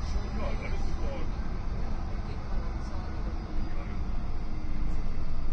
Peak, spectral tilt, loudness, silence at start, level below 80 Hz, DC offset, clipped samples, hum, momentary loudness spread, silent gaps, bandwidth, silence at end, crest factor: -16 dBFS; -7 dB/octave; -37 LUFS; 0 s; -30 dBFS; under 0.1%; under 0.1%; none; 3 LU; none; 6.4 kHz; 0 s; 12 dB